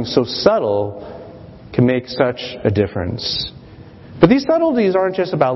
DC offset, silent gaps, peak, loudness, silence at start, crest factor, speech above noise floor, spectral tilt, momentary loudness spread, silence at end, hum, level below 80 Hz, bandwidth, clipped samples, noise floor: under 0.1%; none; 0 dBFS; -17 LUFS; 0 s; 18 dB; 23 dB; -7 dB/octave; 13 LU; 0 s; none; -46 dBFS; 6 kHz; under 0.1%; -39 dBFS